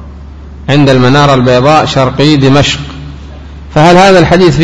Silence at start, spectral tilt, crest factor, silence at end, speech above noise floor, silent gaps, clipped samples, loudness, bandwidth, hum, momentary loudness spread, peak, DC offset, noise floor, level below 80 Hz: 0 s; -6 dB/octave; 6 dB; 0 s; 21 dB; none; 4%; -6 LUFS; 11 kHz; none; 19 LU; 0 dBFS; 3%; -26 dBFS; -26 dBFS